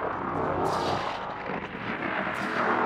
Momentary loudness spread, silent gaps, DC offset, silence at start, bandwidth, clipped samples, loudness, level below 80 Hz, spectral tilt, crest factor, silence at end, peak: 6 LU; none; under 0.1%; 0 s; 16 kHz; under 0.1%; -30 LUFS; -56 dBFS; -5.5 dB/octave; 16 dB; 0 s; -14 dBFS